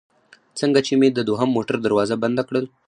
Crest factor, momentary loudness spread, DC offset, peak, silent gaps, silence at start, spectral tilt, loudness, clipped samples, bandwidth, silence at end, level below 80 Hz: 18 dB; 6 LU; under 0.1%; -4 dBFS; none; 0.55 s; -5.5 dB/octave; -20 LUFS; under 0.1%; 10 kHz; 0.2 s; -62 dBFS